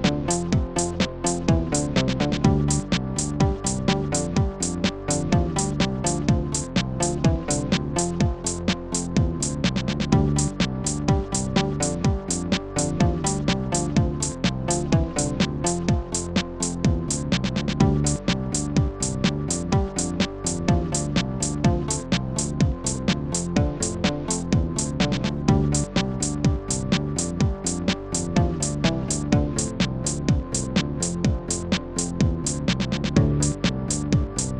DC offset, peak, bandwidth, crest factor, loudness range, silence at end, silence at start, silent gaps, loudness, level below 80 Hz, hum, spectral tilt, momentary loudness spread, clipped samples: 0.4%; -6 dBFS; 12 kHz; 18 dB; 1 LU; 0 s; 0 s; none; -24 LUFS; -34 dBFS; none; -5 dB/octave; 4 LU; under 0.1%